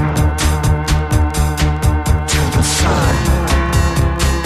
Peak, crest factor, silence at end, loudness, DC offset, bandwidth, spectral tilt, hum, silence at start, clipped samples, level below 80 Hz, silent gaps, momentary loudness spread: 0 dBFS; 12 dB; 0 s; -15 LUFS; under 0.1%; 14.5 kHz; -5 dB/octave; none; 0 s; under 0.1%; -18 dBFS; none; 2 LU